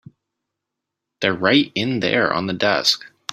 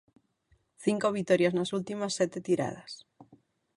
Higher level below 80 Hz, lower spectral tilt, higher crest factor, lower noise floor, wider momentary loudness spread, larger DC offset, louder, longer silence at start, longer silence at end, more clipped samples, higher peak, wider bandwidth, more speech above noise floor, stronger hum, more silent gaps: first, -60 dBFS vs -70 dBFS; about the same, -4 dB/octave vs -5 dB/octave; about the same, 20 dB vs 20 dB; first, -82 dBFS vs -70 dBFS; second, 6 LU vs 15 LU; neither; first, -19 LUFS vs -29 LUFS; first, 1.2 s vs 0.8 s; second, 0.25 s vs 0.55 s; neither; first, 0 dBFS vs -10 dBFS; first, 14.5 kHz vs 11.5 kHz; first, 63 dB vs 41 dB; neither; neither